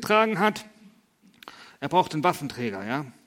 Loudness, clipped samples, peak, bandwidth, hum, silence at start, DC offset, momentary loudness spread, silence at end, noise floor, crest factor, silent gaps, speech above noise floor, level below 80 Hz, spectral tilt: -25 LUFS; under 0.1%; -6 dBFS; 16.5 kHz; none; 0 s; under 0.1%; 22 LU; 0.15 s; -59 dBFS; 20 dB; none; 34 dB; -66 dBFS; -5 dB/octave